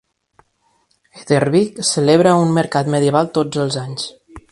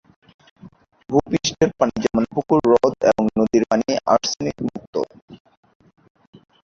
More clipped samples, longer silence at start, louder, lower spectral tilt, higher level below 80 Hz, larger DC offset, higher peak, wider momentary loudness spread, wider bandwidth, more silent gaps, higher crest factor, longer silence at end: neither; first, 1.15 s vs 0.65 s; first, -16 LUFS vs -20 LUFS; about the same, -5.5 dB/octave vs -5 dB/octave; about the same, -54 dBFS vs -52 dBFS; neither; about the same, 0 dBFS vs -2 dBFS; about the same, 11 LU vs 10 LU; first, 11.5 kHz vs 7.6 kHz; second, none vs 4.87-4.93 s, 5.22-5.28 s; about the same, 18 dB vs 20 dB; second, 0.1 s vs 1.3 s